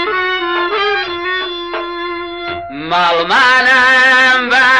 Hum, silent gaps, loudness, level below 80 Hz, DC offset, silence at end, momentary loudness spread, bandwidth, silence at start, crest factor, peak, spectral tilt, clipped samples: none; none; -11 LUFS; -46 dBFS; under 0.1%; 0 s; 15 LU; 12 kHz; 0 s; 10 dB; -2 dBFS; -2.5 dB/octave; under 0.1%